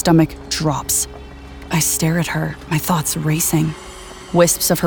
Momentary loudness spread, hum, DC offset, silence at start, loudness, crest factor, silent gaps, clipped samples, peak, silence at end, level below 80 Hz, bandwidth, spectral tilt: 19 LU; none; under 0.1%; 0 s; -18 LUFS; 18 dB; none; under 0.1%; 0 dBFS; 0 s; -38 dBFS; over 20 kHz; -4.5 dB/octave